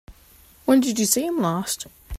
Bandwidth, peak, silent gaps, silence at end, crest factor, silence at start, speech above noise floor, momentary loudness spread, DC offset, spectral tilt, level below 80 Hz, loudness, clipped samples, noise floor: 16 kHz; -4 dBFS; none; 0 s; 18 dB; 0.1 s; 31 dB; 10 LU; under 0.1%; -4 dB/octave; -44 dBFS; -22 LUFS; under 0.1%; -52 dBFS